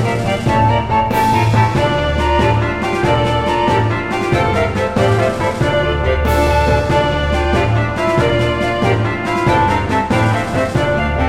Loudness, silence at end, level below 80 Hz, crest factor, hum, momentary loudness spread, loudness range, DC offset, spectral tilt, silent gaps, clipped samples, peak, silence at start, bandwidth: -15 LUFS; 0 s; -26 dBFS; 12 dB; none; 3 LU; 1 LU; under 0.1%; -6.5 dB/octave; none; under 0.1%; -2 dBFS; 0 s; 16 kHz